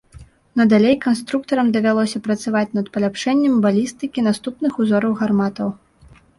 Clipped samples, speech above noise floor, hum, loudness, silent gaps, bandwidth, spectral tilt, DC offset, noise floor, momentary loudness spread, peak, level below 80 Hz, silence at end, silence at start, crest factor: under 0.1%; 31 dB; none; -18 LUFS; none; 11.5 kHz; -6 dB/octave; under 0.1%; -49 dBFS; 7 LU; -4 dBFS; -54 dBFS; 0.65 s; 0.15 s; 14 dB